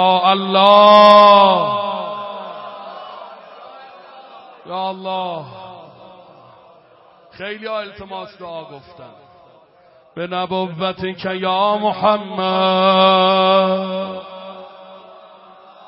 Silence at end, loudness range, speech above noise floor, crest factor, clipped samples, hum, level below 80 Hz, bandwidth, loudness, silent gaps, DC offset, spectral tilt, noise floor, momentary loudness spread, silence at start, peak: 0.9 s; 19 LU; 35 dB; 18 dB; under 0.1%; none; -62 dBFS; 5.8 kHz; -14 LUFS; none; under 0.1%; -7 dB/octave; -50 dBFS; 25 LU; 0 s; 0 dBFS